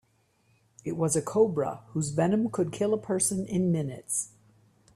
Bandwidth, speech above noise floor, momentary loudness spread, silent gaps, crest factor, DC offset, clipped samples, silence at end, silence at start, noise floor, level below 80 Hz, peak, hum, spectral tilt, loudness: 15 kHz; 41 dB; 7 LU; none; 18 dB; under 0.1%; under 0.1%; 0.7 s; 0.85 s; -68 dBFS; -64 dBFS; -12 dBFS; none; -5.5 dB/octave; -28 LUFS